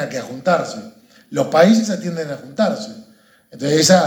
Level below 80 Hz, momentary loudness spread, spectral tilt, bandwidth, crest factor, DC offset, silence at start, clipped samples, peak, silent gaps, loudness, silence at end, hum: -66 dBFS; 16 LU; -4.5 dB/octave; 18 kHz; 18 dB; under 0.1%; 0 s; under 0.1%; 0 dBFS; none; -18 LUFS; 0 s; none